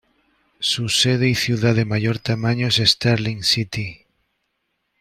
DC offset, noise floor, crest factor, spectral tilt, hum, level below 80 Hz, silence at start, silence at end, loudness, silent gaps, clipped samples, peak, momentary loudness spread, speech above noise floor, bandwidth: under 0.1%; -73 dBFS; 20 dB; -4.5 dB/octave; none; -52 dBFS; 0.6 s; 1.05 s; -19 LUFS; none; under 0.1%; -2 dBFS; 7 LU; 54 dB; 14.5 kHz